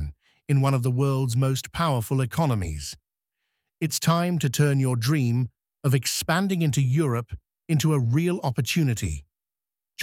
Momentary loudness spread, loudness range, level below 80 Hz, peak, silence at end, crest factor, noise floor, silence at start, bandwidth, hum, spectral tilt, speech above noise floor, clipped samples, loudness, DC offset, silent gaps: 11 LU; 3 LU; -46 dBFS; -8 dBFS; 0 s; 16 dB; under -90 dBFS; 0 s; 16.5 kHz; none; -5.5 dB/octave; over 67 dB; under 0.1%; -24 LUFS; under 0.1%; none